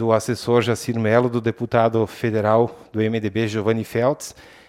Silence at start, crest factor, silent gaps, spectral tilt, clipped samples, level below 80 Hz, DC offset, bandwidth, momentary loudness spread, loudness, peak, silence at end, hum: 0 s; 18 dB; none; -6.5 dB/octave; under 0.1%; -58 dBFS; under 0.1%; 16 kHz; 5 LU; -21 LUFS; -2 dBFS; 0.25 s; none